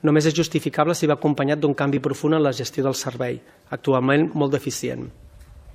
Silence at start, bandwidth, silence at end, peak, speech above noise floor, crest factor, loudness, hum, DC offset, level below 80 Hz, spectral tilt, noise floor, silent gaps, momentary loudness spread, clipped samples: 0.05 s; 15.5 kHz; 0 s; -2 dBFS; 23 dB; 18 dB; -22 LUFS; none; under 0.1%; -54 dBFS; -5.5 dB/octave; -44 dBFS; none; 10 LU; under 0.1%